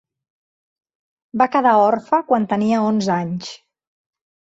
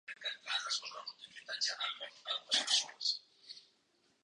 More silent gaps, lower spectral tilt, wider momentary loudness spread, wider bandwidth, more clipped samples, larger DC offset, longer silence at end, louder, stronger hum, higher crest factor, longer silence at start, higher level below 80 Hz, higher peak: neither; first, -6.5 dB/octave vs 3 dB/octave; second, 14 LU vs 21 LU; second, 8 kHz vs 11 kHz; neither; neither; first, 0.95 s vs 0.65 s; first, -17 LUFS vs -36 LUFS; neither; second, 18 dB vs 24 dB; first, 1.35 s vs 0.1 s; first, -64 dBFS vs under -90 dBFS; first, -2 dBFS vs -16 dBFS